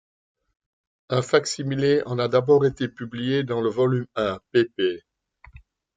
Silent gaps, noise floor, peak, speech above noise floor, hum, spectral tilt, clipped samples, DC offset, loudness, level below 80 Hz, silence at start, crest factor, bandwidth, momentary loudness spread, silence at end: none; -52 dBFS; -4 dBFS; 29 dB; none; -6 dB/octave; under 0.1%; under 0.1%; -23 LUFS; -58 dBFS; 1.1 s; 20 dB; 9.4 kHz; 8 LU; 0.95 s